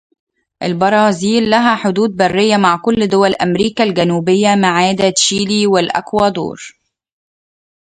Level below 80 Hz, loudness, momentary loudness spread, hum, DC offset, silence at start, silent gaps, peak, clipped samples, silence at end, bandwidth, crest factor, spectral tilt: -50 dBFS; -13 LUFS; 4 LU; none; under 0.1%; 0.6 s; none; 0 dBFS; under 0.1%; 1.15 s; 9.4 kHz; 14 dB; -4.5 dB/octave